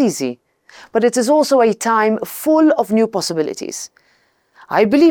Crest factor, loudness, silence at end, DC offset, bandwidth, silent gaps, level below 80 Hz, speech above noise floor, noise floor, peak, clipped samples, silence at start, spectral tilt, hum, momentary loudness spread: 14 dB; -16 LUFS; 0 s; under 0.1%; over 20 kHz; none; -62 dBFS; 44 dB; -59 dBFS; -2 dBFS; under 0.1%; 0 s; -4.5 dB/octave; none; 13 LU